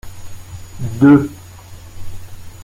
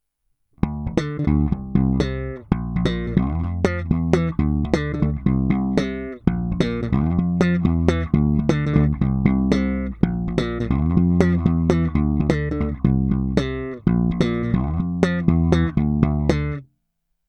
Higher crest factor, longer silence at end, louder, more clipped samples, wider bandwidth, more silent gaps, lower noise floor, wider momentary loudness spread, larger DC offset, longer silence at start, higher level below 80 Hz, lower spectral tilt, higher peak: about the same, 16 dB vs 20 dB; second, 0 s vs 0.65 s; first, -13 LUFS vs -21 LUFS; neither; first, 15.5 kHz vs 8.6 kHz; neither; second, -36 dBFS vs -73 dBFS; first, 27 LU vs 6 LU; neither; second, 0.05 s vs 0.65 s; second, -38 dBFS vs -30 dBFS; about the same, -8 dB/octave vs -8.5 dB/octave; about the same, -2 dBFS vs 0 dBFS